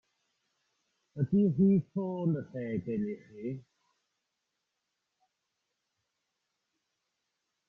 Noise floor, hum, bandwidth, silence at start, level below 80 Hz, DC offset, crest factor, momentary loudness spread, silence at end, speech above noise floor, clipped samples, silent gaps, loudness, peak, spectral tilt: -84 dBFS; none; 3.4 kHz; 1.15 s; -70 dBFS; under 0.1%; 18 dB; 15 LU; 4.1 s; 54 dB; under 0.1%; none; -31 LUFS; -16 dBFS; -11.5 dB/octave